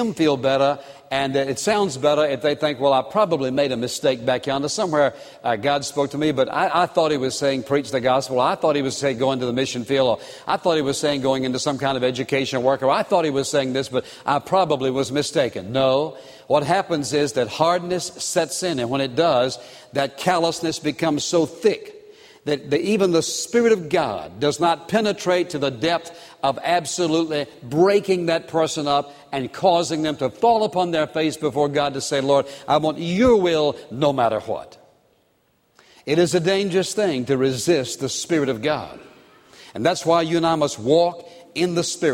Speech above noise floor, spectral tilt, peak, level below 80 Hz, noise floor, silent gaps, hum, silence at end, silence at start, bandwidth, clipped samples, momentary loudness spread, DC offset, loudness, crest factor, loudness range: 43 dB; -4.5 dB/octave; -4 dBFS; -56 dBFS; -64 dBFS; none; none; 0 s; 0 s; 16.5 kHz; under 0.1%; 7 LU; under 0.1%; -21 LUFS; 18 dB; 2 LU